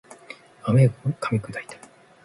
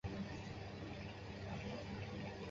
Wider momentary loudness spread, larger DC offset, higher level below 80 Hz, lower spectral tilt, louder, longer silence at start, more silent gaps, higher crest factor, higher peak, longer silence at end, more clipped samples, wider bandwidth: first, 23 LU vs 3 LU; neither; about the same, -58 dBFS vs -58 dBFS; first, -8 dB/octave vs -5.5 dB/octave; first, -23 LUFS vs -48 LUFS; about the same, 0.1 s vs 0.05 s; neither; about the same, 18 dB vs 14 dB; first, -6 dBFS vs -32 dBFS; first, 0.5 s vs 0 s; neither; first, 11.5 kHz vs 7.6 kHz